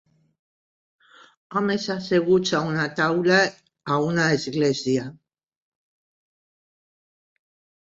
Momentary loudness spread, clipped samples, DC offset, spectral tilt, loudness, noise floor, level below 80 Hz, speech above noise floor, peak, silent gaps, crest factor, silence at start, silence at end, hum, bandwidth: 8 LU; under 0.1%; under 0.1%; -5 dB/octave; -22 LUFS; under -90 dBFS; -64 dBFS; over 68 dB; -6 dBFS; none; 20 dB; 1.5 s; 2.7 s; none; 7.8 kHz